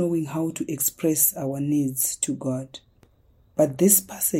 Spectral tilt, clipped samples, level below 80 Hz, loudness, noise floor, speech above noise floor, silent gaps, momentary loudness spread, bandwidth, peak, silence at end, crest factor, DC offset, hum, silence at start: -4.5 dB/octave; under 0.1%; -62 dBFS; -23 LUFS; -59 dBFS; 35 dB; none; 12 LU; 16.5 kHz; -4 dBFS; 0 s; 20 dB; under 0.1%; none; 0 s